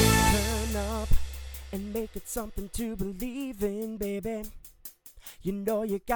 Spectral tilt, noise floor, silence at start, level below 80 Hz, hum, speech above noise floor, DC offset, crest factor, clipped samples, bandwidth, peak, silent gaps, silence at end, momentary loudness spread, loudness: -4.5 dB/octave; -49 dBFS; 0 s; -36 dBFS; none; 17 dB; under 0.1%; 20 dB; under 0.1%; over 20 kHz; -8 dBFS; none; 0 s; 18 LU; -31 LUFS